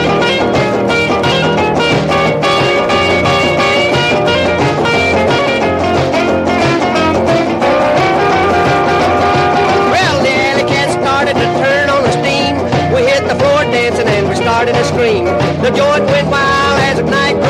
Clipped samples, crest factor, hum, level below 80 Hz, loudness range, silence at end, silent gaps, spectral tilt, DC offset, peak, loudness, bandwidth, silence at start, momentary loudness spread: under 0.1%; 10 dB; none; -36 dBFS; 1 LU; 0 s; none; -5 dB/octave; under 0.1%; 0 dBFS; -11 LUFS; 15 kHz; 0 s; 2 LU